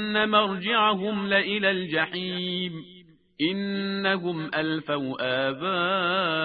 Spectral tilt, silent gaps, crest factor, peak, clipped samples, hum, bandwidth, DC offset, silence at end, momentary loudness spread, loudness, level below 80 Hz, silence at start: -9 dB/octave; none; 20 dB; -6 dBFS; under 0.1%; none; 5 kHz; under 0.1%; 0 s; 7 LU; -25 LUFS; -66 dBFS; 0 s